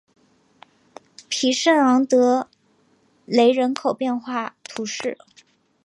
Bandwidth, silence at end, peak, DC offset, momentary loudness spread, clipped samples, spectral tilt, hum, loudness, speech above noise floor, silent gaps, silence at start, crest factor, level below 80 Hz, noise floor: 11 kHz; 0.7 s; -4 dBFS; under 0.1%; 14 LU; under 0.1%; -3 dB/octave; none; -20 LUFS; 42 dB; none; 1.3 s; 18 dB; -76 dBFS; -61 dBFS